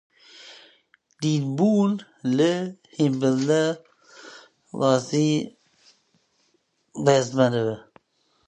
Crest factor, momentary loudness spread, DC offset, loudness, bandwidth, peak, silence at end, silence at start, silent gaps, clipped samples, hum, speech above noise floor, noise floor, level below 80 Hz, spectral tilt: 22 dB; 22 LU; under 0.1%; -23 LUFS; 9.6 kHz; -4 dBFS; 0.65 s; 0.4 s; none; under 0.1%; none; 47 dB; -69 dBFS; -70 dBFS; -6 dB/octave